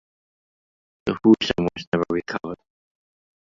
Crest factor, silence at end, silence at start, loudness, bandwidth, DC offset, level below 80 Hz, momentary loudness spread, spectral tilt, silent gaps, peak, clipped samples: 22 dB; 0.9 s; 1.05 s; -22 LUFS; 7.4 kHz; under 0.1%; -54 dBFS; 15 LU; -6.5 dB/octave; 1.87-1.92 s; -2 dBFS; under 0.1%